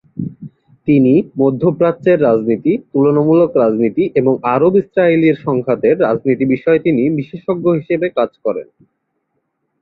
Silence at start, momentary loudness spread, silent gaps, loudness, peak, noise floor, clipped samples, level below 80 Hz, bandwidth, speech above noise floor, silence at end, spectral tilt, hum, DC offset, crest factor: 0.15 s; 9 LU; none; -14 LUFS; 0 dBFS; -69 dBFS; under 0.1%; -54 dBFS; 4.7 kHz; 56 dB; 1.2 s; -11 dB/octave; none; under 0.1%; 14 dB